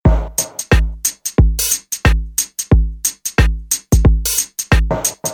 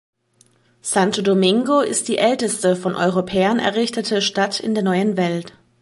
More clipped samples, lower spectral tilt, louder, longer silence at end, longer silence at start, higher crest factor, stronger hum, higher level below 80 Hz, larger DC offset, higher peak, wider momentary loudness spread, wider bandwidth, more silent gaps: neither; about the same, -4 dB/octave vs -4.5 dB/octave; first, -16 LUFS vs -19 LUFS; second, 0 s vs 0.35 s; second, 0.05 s vs 0.85 s; about the same, 14 dB vs 16 dB; neither; first, -18 dBFS vs -60 dBFS; neither; about the same, 0 dBFS vs -2 dBFS; about the same, 6 LU vs 5 LU; first, 19.5 kHz vs 11.5 kHz; neither